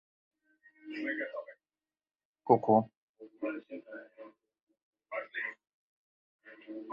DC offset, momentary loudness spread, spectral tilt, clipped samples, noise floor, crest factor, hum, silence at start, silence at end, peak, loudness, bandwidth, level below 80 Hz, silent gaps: under 0.1%; 25 LU; -5.5 dB/octave; under 0.1%; under -90 dBFS; 28 dB; none; 0.85 s; 0 s; -10 dBFS; -33 LUFS; 5.6 kHz; -80 dBFS; 2.25-2.34 s, 2.97-3.14 s, 4.63-4.67 s, 4.82-4.93 s, 5.74-6.39 s